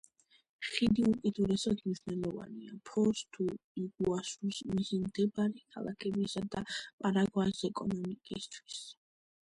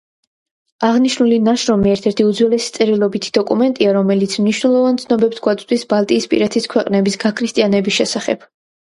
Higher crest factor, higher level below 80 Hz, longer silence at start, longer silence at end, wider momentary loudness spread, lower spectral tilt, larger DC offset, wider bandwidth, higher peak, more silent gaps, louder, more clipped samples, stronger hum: first, 22 dB vs 14 dB; second, -62 dBFS vs -52 dBFS; second, 0.6 s vs 0.8 s; about the same, 0.55 s vs 0.55 s; first, 12 LU vs 4 LU; about the same, -5.5 dB/octave vs -5 dB/octave; neither; about the same, 11.5 kHz vs 11.5 kHz; second, -14 dBFS vs 0 dBFS; first, 3.64-3.75 s, 6.93-6.98 s vs none; second, -35 LUFS vs -15 LUFS; neither; neither